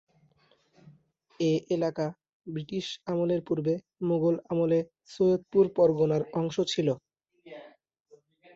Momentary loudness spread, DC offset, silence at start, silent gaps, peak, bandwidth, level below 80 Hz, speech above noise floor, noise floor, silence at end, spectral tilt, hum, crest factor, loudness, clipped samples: 15 LU; under 0.1%; 1.4 s; 2.33-2.40 s; -12 dBFS; 7.8 kHz; -68 dBFS; 39 dB; -67 dBFS; 0.85 s; -7 dB/octave; none; 18 dB; -28 LUFS; under 0.1%